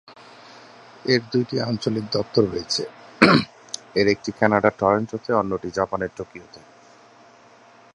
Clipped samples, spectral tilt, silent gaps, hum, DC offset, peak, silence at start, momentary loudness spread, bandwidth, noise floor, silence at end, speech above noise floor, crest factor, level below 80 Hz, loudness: under 0.1%; -5 dB/octave; none; none; under 0.1%; 0 dBFS; 0.1 s; 15 LU; 11.5 kHz; -51 dBFS; 1.4 s; 28 dB; 24 dB; -54 dBFS; -22 LUFS